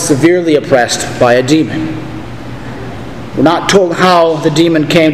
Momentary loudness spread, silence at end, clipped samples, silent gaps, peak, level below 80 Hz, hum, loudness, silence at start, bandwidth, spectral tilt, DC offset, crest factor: 17 LU; 0 s; 0.6%; none; 0 dBFS; -38 dBFS; none; -10 LUFS; 0 s; 15 kHz; -5 dB/octave; 2%; 10 dB